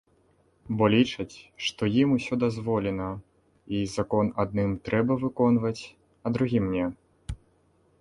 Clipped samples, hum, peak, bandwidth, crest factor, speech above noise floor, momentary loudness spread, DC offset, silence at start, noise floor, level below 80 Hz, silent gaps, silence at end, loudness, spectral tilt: under 0.1%; none; -8 dBFS; 11.5 kHz; 18 dB; 39 dB; 17 LU; under 0.1%; 0.7 s; -65 dBFS; -50 dBFS; none; 0.65 s; -27 LUFS; -6.5 dB/octave